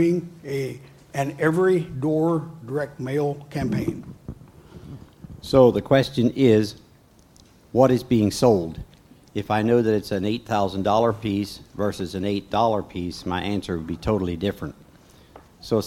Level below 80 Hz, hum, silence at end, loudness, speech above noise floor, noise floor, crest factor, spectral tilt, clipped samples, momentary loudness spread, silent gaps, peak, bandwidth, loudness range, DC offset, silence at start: -48 dBFS; none; 0 s; -23 LUFS; 32 dB; -54 dBFS; 20 dB; -7 dB/octave; under 0.1%; 18 LU; none; -2 dBFS; 16.5 kHz; 6 LU; under 0.1%; 0 s